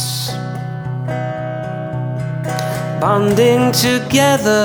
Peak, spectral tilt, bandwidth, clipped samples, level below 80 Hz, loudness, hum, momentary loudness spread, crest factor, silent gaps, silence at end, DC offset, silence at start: -2 dBFS; -5 dB/octave; over 20 kHz; under 0.1%; -48 dBFS; -17 LUFS; none; 11 LU; 16 dB; none; 0 s; under 0.1%; 0 s